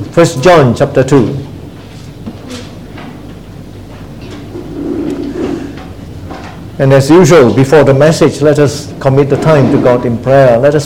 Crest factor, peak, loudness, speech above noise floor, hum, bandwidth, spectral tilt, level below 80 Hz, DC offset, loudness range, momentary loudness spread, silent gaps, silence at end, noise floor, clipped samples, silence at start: 10 dB; 0 dBFS; -8 LUFS; 22 dB; none; 16 kHz; -6.5 dB/octave; -36 dBFS; 0.8%; 17 LU; 23 LU; none; 0 s; -28 dBFS; 1%; 0 s